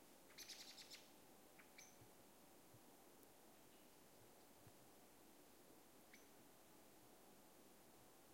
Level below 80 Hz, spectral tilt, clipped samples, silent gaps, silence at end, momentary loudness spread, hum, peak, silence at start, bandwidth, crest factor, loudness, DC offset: -90 dBFS; -2 dB/octave; under 0.1%; none; 0 s; 10 LU; none; -44 dBFS; 0 s; 16.5 kHz; 22 dB; -65 LUFS; under 0.1%